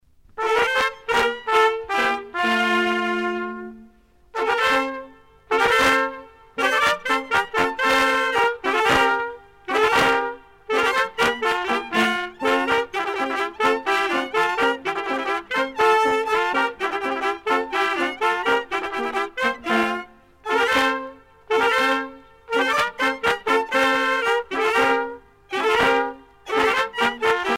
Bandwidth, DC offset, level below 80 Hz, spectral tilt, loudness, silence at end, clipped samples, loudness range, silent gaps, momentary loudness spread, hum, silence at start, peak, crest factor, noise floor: 16.5 kHz; under 0.1%; -54 dBFS; -2.5 dB/octave; -21 LUFS; 0 s; under 0.1%; 3 LU; none; 8 LU; none; 0.35 s; -6 dBFS; 16 dB; -53 dBFS